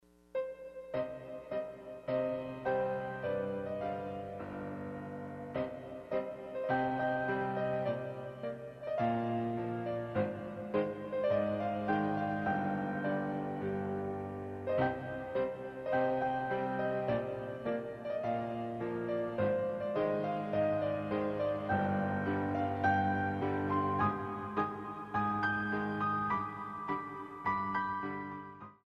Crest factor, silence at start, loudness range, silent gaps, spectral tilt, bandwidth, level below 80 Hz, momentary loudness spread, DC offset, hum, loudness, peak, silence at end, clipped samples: 16 dB; 0.35 s; 5 LU; none; -8.5 dB/octave; 9.8 kHz; -66 dBFS; 10 LU; under 0.1%; none; -36 LUFS; -18 dBFS; 0.1 s; under 0.1%